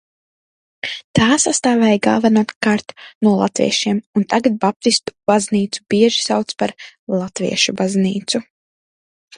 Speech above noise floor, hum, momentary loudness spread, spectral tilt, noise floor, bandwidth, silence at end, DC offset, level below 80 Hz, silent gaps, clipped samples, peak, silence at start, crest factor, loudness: over 73 dB; none; 9 LU; -4 dB/octave; under -90 dBFS; 11 kHz; 0.95 s; under 0.1%; -52 dBFS; 1.04-1.14 s, 2.56-2.61 s, 3.15-3.21 s, 4.06-4.13 s, 4.76-4.80 s, 6.99-7.07 s; under 0.1%; 0 dBFS; 0.85 s; 18 dB; -17 LUFS